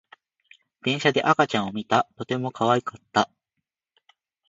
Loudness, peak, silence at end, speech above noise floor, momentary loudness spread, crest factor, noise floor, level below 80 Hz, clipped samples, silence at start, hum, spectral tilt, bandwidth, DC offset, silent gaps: -24 LUFS; -4 dBFS; 1.25 s; 59 dB; 8 LU; 22 dB; -83 dBFS; -64 dBFS; under 0.1%; 0.85 s; none; -5 dB/octave; 8 kHz; under 0.1%; none